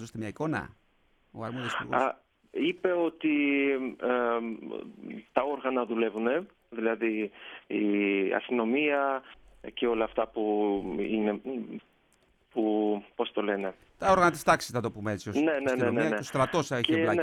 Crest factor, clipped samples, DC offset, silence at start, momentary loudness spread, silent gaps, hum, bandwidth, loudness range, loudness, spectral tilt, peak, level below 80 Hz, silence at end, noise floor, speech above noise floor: 20 dB; under 0.1%; under 0.1%; 0 s; 13 LU; none; none; 14.5 kHz; 4 LU; -29 LUFS; -5.5 dB/octave; -10 dBFS; -62 dBFS; 0 s; -67 dBFS; 38 dB